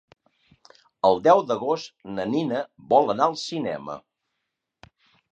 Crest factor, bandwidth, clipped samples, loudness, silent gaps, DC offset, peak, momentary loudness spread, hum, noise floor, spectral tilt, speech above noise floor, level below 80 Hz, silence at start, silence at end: 20 dB; 9 kHz; under 0.1%; -23 LUFS; none; under 0.1%; -4 dBFS; 15 LU; none; -81 dBFS; -5.5 dB/octave; 58 dB; -66 dBFS; 1.05 s; 1.3 s